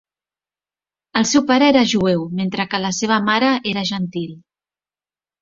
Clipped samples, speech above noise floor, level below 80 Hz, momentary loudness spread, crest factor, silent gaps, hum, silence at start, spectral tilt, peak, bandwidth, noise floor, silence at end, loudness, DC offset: under 0.1%; over 73 dB; -56 dBFS; 10 LU; 18 dB; none; none; 1.15 s; -4 dB/octave; -2 dBFS; 7.8 kHz; under -90 dBFS; 1.05 s; -17 LUFS; under 0.1%